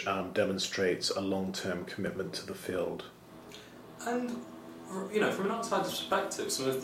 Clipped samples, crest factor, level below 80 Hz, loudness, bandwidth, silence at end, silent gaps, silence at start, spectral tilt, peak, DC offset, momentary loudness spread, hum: under 0.1%; 18 dB; -68 dBFS; -33 LUFS; 16 kHz; 0 s; none; 0 s; -4 dB/octave; -16 dBFS; under 0.1%; 18 LU; none